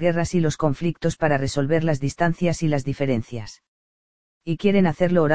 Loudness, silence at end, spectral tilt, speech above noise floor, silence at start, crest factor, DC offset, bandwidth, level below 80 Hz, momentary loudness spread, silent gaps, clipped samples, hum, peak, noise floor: -22 LUFS; 0 s; -6.5 dB/octave; over 69 dB; 0 s; 18 dB; 2%; 9.6 kHz; -46 dBFS; 10 LU; 3.68-4.41 s; under 0.1%; none; -4 dBFS; under -90 dBFS